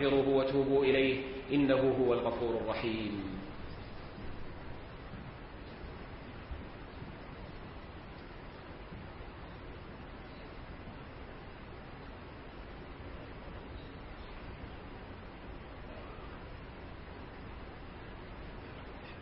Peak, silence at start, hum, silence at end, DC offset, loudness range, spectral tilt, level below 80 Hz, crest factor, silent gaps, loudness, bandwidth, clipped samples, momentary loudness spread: -16 dBFS; 0 s; none; 0 s; under 0.1%; 16 LU; -9.5 dB/octave; -52 dBFS; 22 dB; none; -37 LUFS; 5.6 kHz; under 0.1%; 19 LU